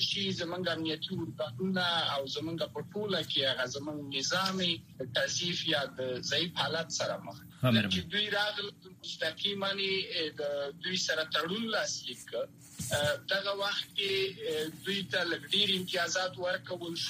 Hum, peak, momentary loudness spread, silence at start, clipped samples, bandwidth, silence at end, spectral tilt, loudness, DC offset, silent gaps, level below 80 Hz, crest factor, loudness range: none; -14 dBFS; 9 LU; 0 s; under 0.1%; 15.5 kHz; 0 s; -3 dB/octave; -32 LUFS; under 0.1%; none; -68 dBFS; 20 dB; 2 LU